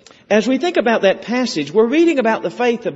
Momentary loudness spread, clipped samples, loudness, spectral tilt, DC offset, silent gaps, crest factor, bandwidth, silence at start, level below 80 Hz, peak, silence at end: 5 LU; under 0.1%; -16 LUFS; -3.5 dB/octave; under 0.1%; none; 16 dB; 8 kHz; 0.3 s; -62 dBFS; 0 dBFS; 0 s